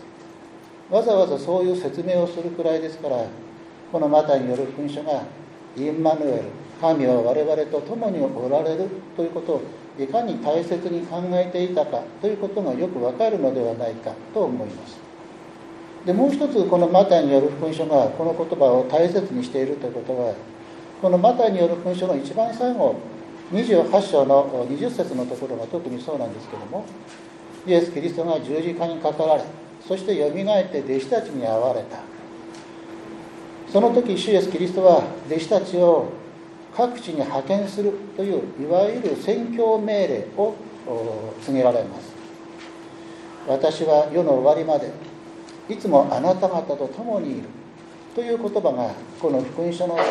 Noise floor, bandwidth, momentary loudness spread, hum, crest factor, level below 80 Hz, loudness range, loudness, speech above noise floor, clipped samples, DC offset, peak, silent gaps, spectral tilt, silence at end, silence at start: -43 dBFS; 11 kHz; 21 LU; none; 20 dB; -68 dBFS; 6 LU; -22 LUFS; 22 dB; under 0.1%; under 0.1%; -2 dBFS; none; -7 dB/octave; 0 s; 0 s